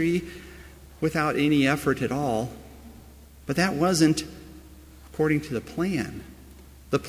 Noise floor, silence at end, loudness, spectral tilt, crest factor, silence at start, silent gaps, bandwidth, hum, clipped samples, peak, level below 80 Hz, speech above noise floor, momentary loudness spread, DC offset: -48 dBFS; 0 s; -25 LUFS; -5.5 dB/octave; 18 dB; 0 s; none; 16 kHz; none; under 0.1%; -8 dBFS; -48 dBFS; 24 dB; 24 LU; under 0.1%